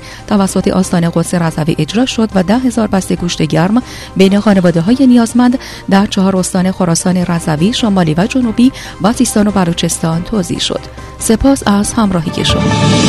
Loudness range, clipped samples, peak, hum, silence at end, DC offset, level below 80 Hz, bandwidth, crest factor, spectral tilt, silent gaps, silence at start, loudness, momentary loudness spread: 2 LU; 0.2%; 0 dBFS; none; 0 s; under 0.1%; -32 dBFS; 13.5 kHz; 12 dB; -5.5 dB/octave; none; 0 s; -12 LUFS; 6 LU